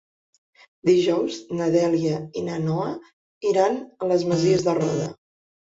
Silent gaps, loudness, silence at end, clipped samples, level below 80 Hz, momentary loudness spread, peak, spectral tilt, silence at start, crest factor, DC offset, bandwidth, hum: 3.13-3.41 s; -23 LUFS; 0.6 s; under 0.1%; -62 dBFS; 9 LU; -6 dBFS; -6.5 dB/octave; 0.85 s; 16 dB; under 0.1%; 7.8 kHz; none